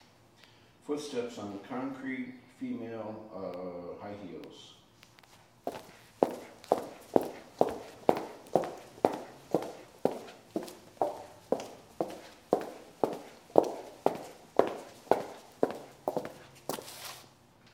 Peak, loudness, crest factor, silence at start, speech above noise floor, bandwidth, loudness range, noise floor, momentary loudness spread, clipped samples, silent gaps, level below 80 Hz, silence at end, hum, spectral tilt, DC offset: -2 dBFS; -35 LUFS; 34 dB; 0.85 s; 21 dB; 17.5 kHz; 8 LU; -60 dBFS; 14 LU; under 0.1%; none; -72 dBFS; 0.45 s; none; -5.5 dB/octave; under 0.1%